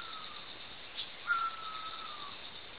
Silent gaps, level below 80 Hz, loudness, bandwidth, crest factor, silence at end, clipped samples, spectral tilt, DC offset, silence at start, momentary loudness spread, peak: none; -70 dBFS; -39 LUFS; 4 kHz; 20 dB; 0 s; under 0.1%; 1.5 dB/octave; 0.3%; 0 s; 10 LU; -22 dBFS